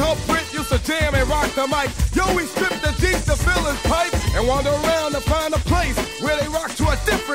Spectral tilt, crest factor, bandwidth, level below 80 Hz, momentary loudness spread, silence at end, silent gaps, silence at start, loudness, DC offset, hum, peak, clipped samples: -4.5 dB/octave; 14 dB; 16 kHz; -26 dBFS; 3 LU; 0 s; none; 0 s; -20 LUFS; 0.3%; none; -4 dBFS; under 0.1%